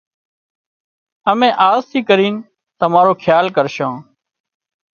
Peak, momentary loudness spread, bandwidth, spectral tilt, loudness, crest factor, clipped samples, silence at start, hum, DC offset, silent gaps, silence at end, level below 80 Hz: 0 dBFS; 10 LU; 6.8 kHz; -6 dB/octave; -14 LUFS; 16 dB; under 0.1%; 1.25 s; none; under 0.1%; none; 0.9 s; -62 dBFS